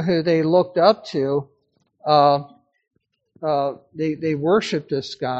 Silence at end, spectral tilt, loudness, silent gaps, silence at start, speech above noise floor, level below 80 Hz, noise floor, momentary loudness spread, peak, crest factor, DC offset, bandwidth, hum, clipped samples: 0 s; -5 dB/octave; -20 LUFS; none; 0 s; 46 dB; -64 dBFS; -65 dBFS; 11 LU; 0 dBFS; 20 dB; under 0.1%; 8 kHz; none; under 0.1%